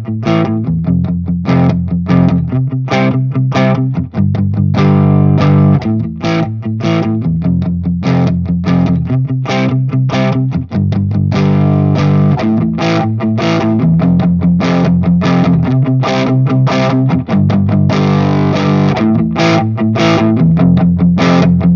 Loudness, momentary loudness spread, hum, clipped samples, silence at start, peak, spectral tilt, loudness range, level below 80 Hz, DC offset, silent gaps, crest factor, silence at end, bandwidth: -12 LUFS; 5 LU; none; under 0.1%; 0 s; 0 dBFS; -8 dB/octave; 3 LU; -36 dBFS; under 0.1%; none; 10 dB; 0 s; 7 kHz